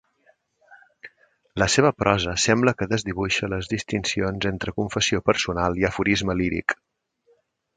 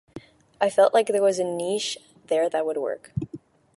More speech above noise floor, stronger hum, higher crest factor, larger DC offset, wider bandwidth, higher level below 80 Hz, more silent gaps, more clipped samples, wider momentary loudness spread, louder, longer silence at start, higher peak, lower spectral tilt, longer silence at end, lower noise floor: first, 42 dB vs 22 dB; neither; first, 24 dB vs 18 dB; neither; second, 9.6 kHz vs 11.5 kHz; first, -44 dBFS vs -60 dBFS; neither; neither; second, 8 LU vs 14 LU; about the same, -23 LUFS vs -24 LUFS; first, 0.7 s vs 0.15 s; first, 0 dBFS vs -6 dBFS; about the same, -4 dB/octave vs -4.5 dB/octave; first, 1.05 s vs 0.4 s; first, -64 dBFS vs -45 dBFS